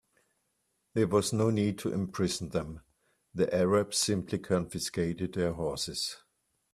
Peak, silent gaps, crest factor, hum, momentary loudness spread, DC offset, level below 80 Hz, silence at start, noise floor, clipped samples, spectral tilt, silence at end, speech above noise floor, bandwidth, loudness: -14 dBFS; none; 18 dB; none; 9 LU; under 0.1%; -60 dBFS; 0.95 s; -78 dBFS; under 0.1%; -5 dB/octave; 0.55 s; 48 dB; 15 kHz; -31 LUFS